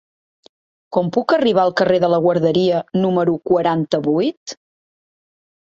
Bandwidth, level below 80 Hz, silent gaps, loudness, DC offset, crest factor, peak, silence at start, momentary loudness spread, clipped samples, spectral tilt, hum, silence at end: 7.6 kHz; -60 dBFS; 4.37-4.46 s; -17 LUFS; under 0.1%; 16 dB; -2 dBFS; 0.9 s; 7 LU; under 0.1%; -6.5 dB/octave; none; 1.2 s